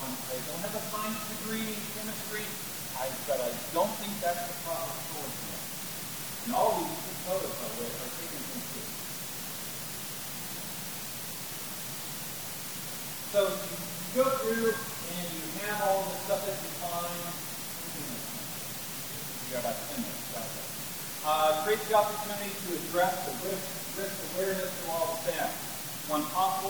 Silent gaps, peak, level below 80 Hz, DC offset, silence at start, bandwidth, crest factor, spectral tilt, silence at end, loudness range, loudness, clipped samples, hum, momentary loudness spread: none; -12 dBFS; -66 dBFS; 0.2%; 0 s; over 20 kHz; 22 dB; -3 dB/octave; 0 s; 6 LU; -33 LUFS; under 0.1%; none; 8 LU